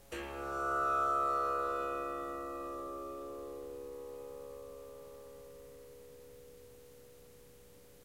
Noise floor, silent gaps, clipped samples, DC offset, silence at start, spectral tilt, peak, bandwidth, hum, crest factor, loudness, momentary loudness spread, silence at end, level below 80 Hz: -59 dBFS; none; under 0.1%; under 0.1%; 0 s; -4.5 dB/octave; -24 dBFS; 16 kHz; none; 16 dB; -37 LUFS; 26 LU; 0 s; -62 dBFS